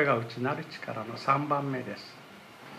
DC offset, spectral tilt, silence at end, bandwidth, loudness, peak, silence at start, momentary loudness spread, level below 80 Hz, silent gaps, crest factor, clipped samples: under 0.1%; -6.5 dB/octave; 0 s; 14.5 kHz; -31 LUFS; -10 dBFS; 0 s; 20 LU; -78 dBFS; none; 22 dB; under 0.1%